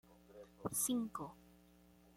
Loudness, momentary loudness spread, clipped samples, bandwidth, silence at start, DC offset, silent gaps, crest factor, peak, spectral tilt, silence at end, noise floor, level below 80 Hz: -41 LUFS; 23 LU; under 0.1%; 16.5 kHz; 0.1 s; under 0.1%; none; 20 dB; -26 dBFS; -3.5 dB/octave; 0.75 s; -66 dBFS; -72 dBFS